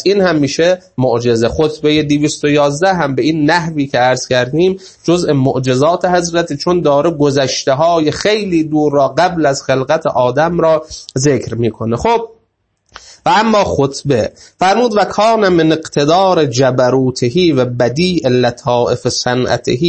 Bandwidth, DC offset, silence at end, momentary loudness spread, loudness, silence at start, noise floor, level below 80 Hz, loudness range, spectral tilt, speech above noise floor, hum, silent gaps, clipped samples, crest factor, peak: 8.8 kHz; under 0.1%; 0 s; 4 LU; -13 LUFS; 0 s; -62 dBFS; -42 dBFS; 3 LU; -5.5 dB/octave; 50 dB; none; none; under 0.1%; 12 dB; 0 dBFS